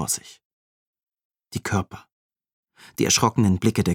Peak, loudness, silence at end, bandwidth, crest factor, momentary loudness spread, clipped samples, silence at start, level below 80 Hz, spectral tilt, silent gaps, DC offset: -2 dBFS; -22 LUFS; 0 s; 17.5 kHz; 22 dB; 17 LU; under 0.1%; 0 s; -54 dBFS; -4 dB/octave; 0.45-0.93 s, 1.03-1.07 s, 1.25-1.30 s, 2.12-2.30 s, 2.53-2.63 s; under 0.1%